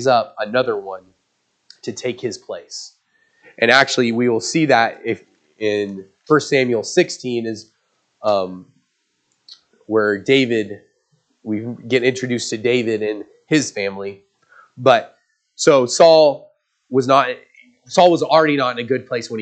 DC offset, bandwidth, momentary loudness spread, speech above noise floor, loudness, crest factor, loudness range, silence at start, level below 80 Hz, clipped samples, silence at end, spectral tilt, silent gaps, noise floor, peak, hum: under 0.1%; 9.2 kHz; 18 LU; 52 dB; -17 LUFS; 18 dB; 7 LU; 0 s; -70 dBFS; under 0.1%; 0 s; -4 dB/octave; none; -69 dBFS; 0 dBFS; none